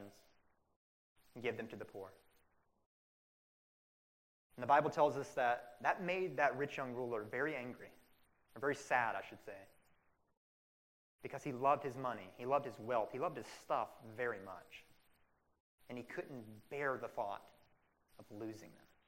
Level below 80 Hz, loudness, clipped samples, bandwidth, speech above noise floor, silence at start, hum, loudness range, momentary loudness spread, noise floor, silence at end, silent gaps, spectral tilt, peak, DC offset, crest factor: -80 dBFS; -40 LUFS; under 0.1%; 16 kHz; 36 dB; 0 s; none; 14 LU; 18 LU; -76 dBFS; 0.3 s; 0.76-1.16 s, 2.86-4.50 s, 10.37-11.19 s, 15.60-15.78 s; -5.5 dB/octave; -18 dBFS; under 0.1%; 24 dB